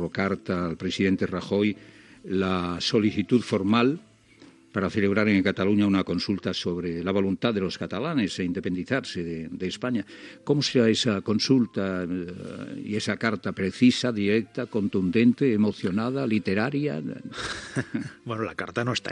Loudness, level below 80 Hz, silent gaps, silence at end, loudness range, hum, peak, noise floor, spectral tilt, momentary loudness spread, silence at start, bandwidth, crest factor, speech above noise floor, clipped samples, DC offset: -26 LUFS; -62 dBFS; none; 0 s; 4 LU; none; -6 dBFS; -53 dBFS; -6 dB/octave; 11 LU; 0 s; 10.5 kHz; 20 dB; 28 dB; under 0.1%; under 0.1%